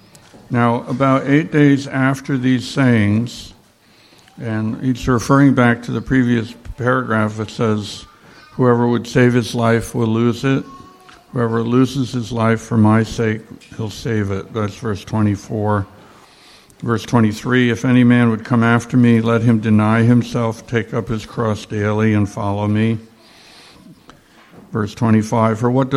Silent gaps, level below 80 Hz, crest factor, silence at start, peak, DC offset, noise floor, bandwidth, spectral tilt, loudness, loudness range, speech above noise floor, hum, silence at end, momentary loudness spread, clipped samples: none; -46 dBFS; 16 dB; 0.35 s; -2 dBFS; under 0.1%; -50 dBFS; 13 kHz; -7 dB/octave; -17 LUFS; 6 LU; 35 dB; none; 0 s; 11 LU; under 0.1%